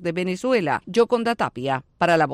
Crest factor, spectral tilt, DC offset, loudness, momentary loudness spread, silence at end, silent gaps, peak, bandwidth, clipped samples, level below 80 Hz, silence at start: 14 dB; -5.5 dB/octave; under 0.1%; -22 LUFS; 6 LU; 0 s; none; -6 dBFS; 12.5 kHz; under 0.1%; -58 dBFS; 0 s